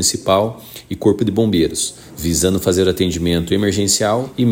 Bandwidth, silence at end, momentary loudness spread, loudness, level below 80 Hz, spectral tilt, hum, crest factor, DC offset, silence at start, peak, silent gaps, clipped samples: 16.5 kHz; 0 s; 8 LU; -17 LUFS; -38 dBFS; -4.5 dB/octave; none; 16 dB; under 0.1%; 0 s; -2 dBFS; none; under 0.1%